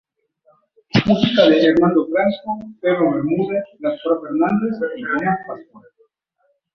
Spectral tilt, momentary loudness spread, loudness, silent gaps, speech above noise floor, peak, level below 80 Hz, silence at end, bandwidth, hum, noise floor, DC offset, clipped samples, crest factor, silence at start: -7.5 dB/octave; 12 LU; -18 LUFS; none; 49 dB; -2 dBFS; -54 dBFS; 0.95 s; 6.4 kHz; none; -66 dBFS; under 0.1%; under 0.1%; 18 dB; 0.95 s